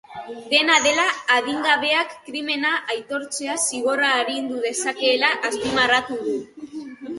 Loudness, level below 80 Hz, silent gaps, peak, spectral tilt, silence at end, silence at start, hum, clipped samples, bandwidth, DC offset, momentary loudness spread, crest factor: -20 LUFS; -62 dBFS; none; -2 dBFS; -1 dB/octave; 0 s; 0.1 s; none; under 0.1%; 12 kHz; under 0.1%; 13 LU; 20 dB